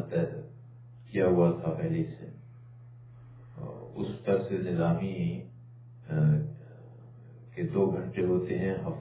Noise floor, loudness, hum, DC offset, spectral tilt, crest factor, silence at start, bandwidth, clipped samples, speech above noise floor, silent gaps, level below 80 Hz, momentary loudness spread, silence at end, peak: -50 dBFS; -30 LUFS; none; under 0.1%; -9 dB/octave; 18 dB; 0 s; 4 kHz; under 0.1%; 21 dB; none; -58 dBFS; 25 LU; 0 s; -12 dBFS